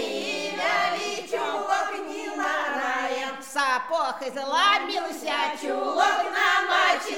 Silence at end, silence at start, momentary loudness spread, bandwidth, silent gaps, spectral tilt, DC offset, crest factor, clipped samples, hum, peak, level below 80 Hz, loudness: 0 s; 0 s; 8 LU; 17 kHz; none; -1 dB/octave; 0.2%; 18 dB; under 0.1%; none; -8 dBFS; -76 dBFS; -25 LUFS